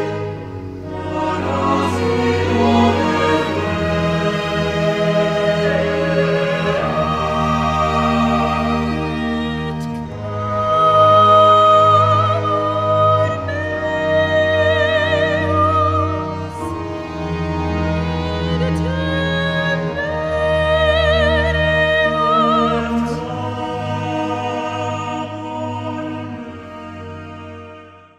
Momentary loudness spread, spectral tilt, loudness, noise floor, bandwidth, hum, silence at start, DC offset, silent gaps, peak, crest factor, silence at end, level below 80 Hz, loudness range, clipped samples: 12 LU; -6.5 dB/octave; -17 LUFS; -40 dBFS; 12 kHz; none; 0 s; under 0.1%; none; -2 dBFS; 16 dB; 0.2 s; -34 dBFS; 9 LU; under 0.1%